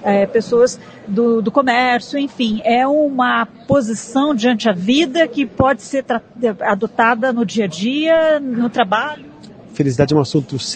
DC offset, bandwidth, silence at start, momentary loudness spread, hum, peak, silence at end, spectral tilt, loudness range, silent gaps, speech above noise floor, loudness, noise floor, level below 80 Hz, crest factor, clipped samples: under 0.1%; 9.4 kHz; 0 s; 6 LU; none; 0 dBFS; 0 s; -5.5 dB/octave; 1 LU; none; 22 dB; -16 LUFS; -38 dBFS; -50 dBFS; 16 dB; under 0.1%